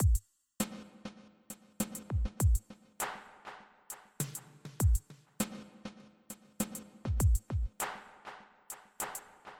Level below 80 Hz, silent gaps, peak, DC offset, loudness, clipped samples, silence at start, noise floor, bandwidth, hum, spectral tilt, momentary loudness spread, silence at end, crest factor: -38 dBFS; none; -18 dBFS; under 0.1%; -36 LUFS; under 0.1%; 0 s; -54 dBFS; 18 kHz; none; -5 dB/octave; 19 LU; 0.05 s; 16 dB